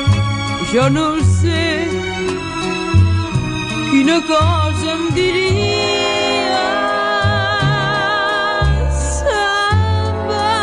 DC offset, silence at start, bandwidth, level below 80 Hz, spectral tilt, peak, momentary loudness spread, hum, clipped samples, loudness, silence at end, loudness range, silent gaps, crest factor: under 0.1%; 0 s; 10.5 kHz; -28 dBFS; -5 dB/octave; 0 dBFS; 5 LU; none; under 0.1%; -16 LUFS; 0 s; 1 LU; none; 14 dB